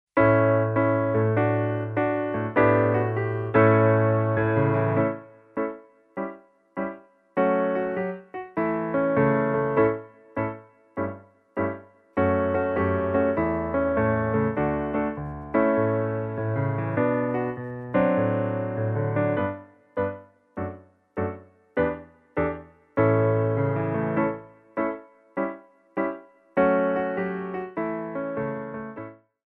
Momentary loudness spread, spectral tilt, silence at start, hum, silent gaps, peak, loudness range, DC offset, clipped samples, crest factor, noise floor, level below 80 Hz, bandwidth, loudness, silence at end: 14 LU; -11.5 dB/octave; 0.15 s; none; none; -6 dBFS; 7 LU; under 0.1%; under 0.1%; 18 dB; -44 dBFS; -52 dBFS; 3.9 kHz; -25 LUFS; 0.35 s